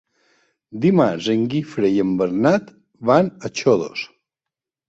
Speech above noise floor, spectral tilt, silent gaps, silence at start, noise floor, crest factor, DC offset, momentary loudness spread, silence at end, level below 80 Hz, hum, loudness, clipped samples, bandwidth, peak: 69 dB; -6.5 dB/octave; none; 0.7 s; -87 dBFS; 18 dB; under 0.1%; 10 LU; 0.8 s; -58 dBFS; none; -19 LUFS; under 0.1%; 8 kHz; -2 dBFS